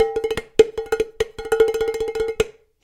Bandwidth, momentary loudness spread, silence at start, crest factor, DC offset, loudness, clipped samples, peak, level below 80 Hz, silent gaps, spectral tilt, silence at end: 15.5 kHz; 7 LU; 0 s; 20 dB; under 0.1%; -21 LUFS; under 0.1%; 0 dBFS; -44 dBFS; none; -4 dB/octave; 0.35 s